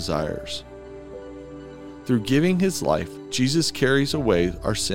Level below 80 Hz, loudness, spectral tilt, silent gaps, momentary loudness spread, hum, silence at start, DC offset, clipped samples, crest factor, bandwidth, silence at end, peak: -44 dBFS; -23 LUFS; -5 dB/octave; none; 19 LU; none; 0 s; 0.5%; under 0.1%; 18 dB; 17 kHz; 0 s; -6 dBFS